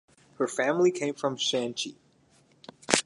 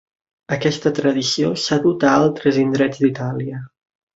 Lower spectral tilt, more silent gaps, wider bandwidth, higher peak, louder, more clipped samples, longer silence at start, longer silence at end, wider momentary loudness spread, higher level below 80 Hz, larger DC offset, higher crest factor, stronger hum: second, -3 dB/octave vs -5.5 dB/octave; neither; first, 11.5 kHz vs 8 kHz; about the same, 0 dBFS vs -2 dBFS; second, -28 LUFS vs -18 LUFS; neither; about the same, 0.4 s vs 0.5 s; second, 0.05 s vs 0.5 s; about the same, 11 LU vs 11 LU; second, -66 dBFS vs -58 dBFS; neither; first, 30 dB vs 16 dB; neither